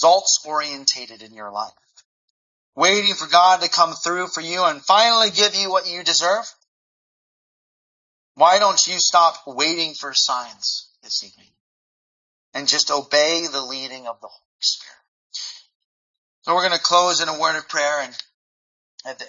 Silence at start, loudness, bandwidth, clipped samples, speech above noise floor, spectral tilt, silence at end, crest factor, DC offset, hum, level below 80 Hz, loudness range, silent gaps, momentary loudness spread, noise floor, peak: 0 s; -18 LUFS; 7.6 kHz; under 0.1%; over 71 dB; 0 dB/octave; 0 s; 22 dB; under 0.1%; none; -76 dBFS; 6 LU; 2.05-2.73 s, 6.68-8.35 s, 11.60-12.52 s, 14.45-14.59 s, 15.08-15.30 s, 15.75-16.42 s, 18.34-18.98 s; 17 LU; under -90 dBFS; 0 dBFS